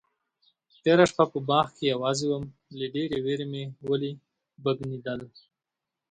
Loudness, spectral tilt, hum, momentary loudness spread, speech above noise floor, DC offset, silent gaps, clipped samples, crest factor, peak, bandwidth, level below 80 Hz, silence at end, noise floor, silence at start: -27 LUFS; -5.5 dB/octave; none; 15 LU; 61 dB; under 0.1%; none; under 0.1%; 22 dB; -6 dBFS; 9.4 kHz; -64 dBFS; 0.85 s; -87 dBFS; 0.85 s